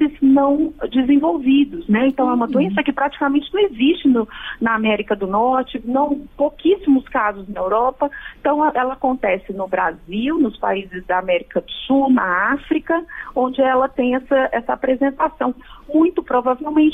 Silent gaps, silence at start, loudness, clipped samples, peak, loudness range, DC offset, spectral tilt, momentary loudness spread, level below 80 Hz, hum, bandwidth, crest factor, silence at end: none; 0 s; -18 LUFS; under 0.1%; -6 dBFS; 3 LU; under 0.1%; -8 dB/octave; 7 LU; -46 dBFS; none; 3.8 kHz; 12 dB; 0 s